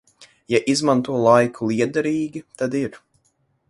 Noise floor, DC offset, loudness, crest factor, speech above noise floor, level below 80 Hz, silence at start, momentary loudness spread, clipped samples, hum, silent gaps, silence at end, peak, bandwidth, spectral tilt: -66 dBFS; under 0.1%; -20 LUFS; 20 dB; 47 dB; -62 dBFS; 0.2 s; 11 LU; under 0.1%; none; none; 0.75 s; -2 dBFS; 11.5 kHz; -5.5 dB/octave